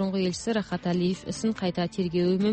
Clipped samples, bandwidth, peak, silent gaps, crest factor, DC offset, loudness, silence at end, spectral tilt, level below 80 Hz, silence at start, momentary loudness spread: under 0.1%; 8.8 kHz; -14 dBFS; none; 12 dB; under 0.1%; -28 LUFS; 0 s; -6 dB/octave; -56 dBFS; 0 s; 4 LU